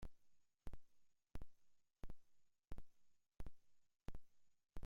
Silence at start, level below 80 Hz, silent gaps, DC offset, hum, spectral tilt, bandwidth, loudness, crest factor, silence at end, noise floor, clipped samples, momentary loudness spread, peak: 0 s; -60 dBFS; none; under 0.1%; none; -6.5 dB/octave; 9.4 kHz; -65 LUFS; 14 dB; 0 s; -72 dBFS; under 0.1%; 5 LU; -38 dBFS